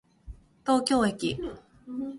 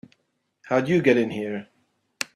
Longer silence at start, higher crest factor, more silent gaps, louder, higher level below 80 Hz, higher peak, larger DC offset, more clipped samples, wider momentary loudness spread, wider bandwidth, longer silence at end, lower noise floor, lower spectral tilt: second, 0.25 s vs 0.65 s; about the same, 20 dB vs 20 dB; neither; second, -27 LUFS vs -23 LUFS; first, -52 dBFS vs -66 dBFS; second, -10 dBFS vs -4 dBFS; neither; neither; first, 16 LU vs 13 LU; second, 11.5 kHz vs 14.5 kHz; about the same, 0 s vs 0.1 s; second, -48 dBFS vs -73 dBFS; about the same, -4.5 dB/octave vs -5.5 dB/octave